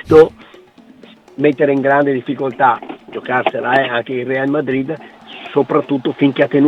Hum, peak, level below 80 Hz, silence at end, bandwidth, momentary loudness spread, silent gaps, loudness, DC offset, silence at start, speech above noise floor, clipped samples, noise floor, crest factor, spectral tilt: none; 0 dBFS; -52 dBFS; 0 s; 6.8 kHz; 14 LU; none; -15 LUFS; under 0.1%; 0.05 s; 29 dB; under 0.1%; -43 dBFS; 16 dB; -7.5 dB/octave